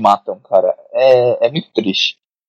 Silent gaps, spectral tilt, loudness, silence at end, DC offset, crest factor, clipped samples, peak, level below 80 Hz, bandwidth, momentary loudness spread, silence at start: none; -5 dB/octave; -15 LUFS; 0.35 s; under 0.1%; 14 dB; under 0.1%; 0 dBFS; -68 dBFS; 7.8 kHz; 7 LU; 0 s